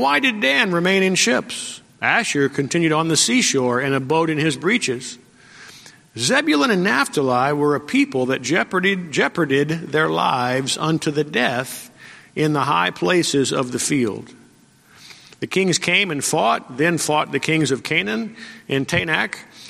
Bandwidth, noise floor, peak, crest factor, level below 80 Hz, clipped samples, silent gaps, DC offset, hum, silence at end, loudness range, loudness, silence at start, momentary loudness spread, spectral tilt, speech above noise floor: 15.5 kHz; -52 dBFS; 0 dBFS; 20 dB; -60 dBFS; under 0.1%; none; under 0.1%; none; 0 s; 3 LU; -19 LUFS; 0 s; 9 LU; -3.5 dB/octave; 33 dB